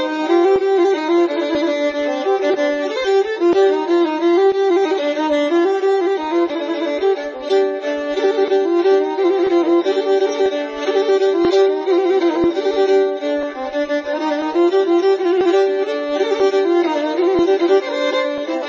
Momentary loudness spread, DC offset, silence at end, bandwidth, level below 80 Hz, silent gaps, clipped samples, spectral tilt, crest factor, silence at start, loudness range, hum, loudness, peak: 6 LU; under 0.1%; 0 s; 7.4 kHz; -56 dBFS; none; under 0.1%; -4.5 dB/octave; 12 dB; 0 s; 2 LU; none; -17 LUFS; -4 dBFS